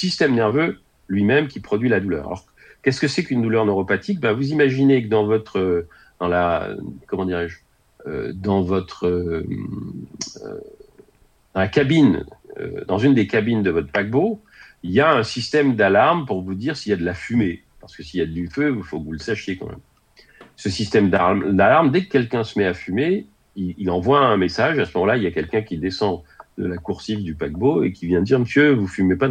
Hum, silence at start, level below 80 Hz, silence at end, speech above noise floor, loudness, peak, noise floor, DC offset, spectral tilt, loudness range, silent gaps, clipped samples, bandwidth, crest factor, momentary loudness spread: none; 0 s; -48 dBFS; 0 s; 37 dB; -20 LUFS; -2 dBFS; -57 dBFS; under 0.1%; -6.5 dB/octave; 6 LU; none; under 0.1%; 9.4 kHz; 18 dB; 15 LU